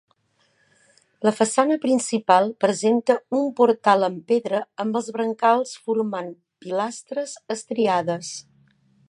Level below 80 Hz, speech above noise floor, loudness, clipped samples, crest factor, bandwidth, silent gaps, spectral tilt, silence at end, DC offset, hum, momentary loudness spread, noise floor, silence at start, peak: -78 dBFS; 44 dB; -22 LUFS; under 0.1%; 20 dB; 11.5 kHz; none; -4.5 dB/octave; 0.7 s; under 0.1%; none; 11 LU; -66 dBFS; 1.2 s; -2 dBFS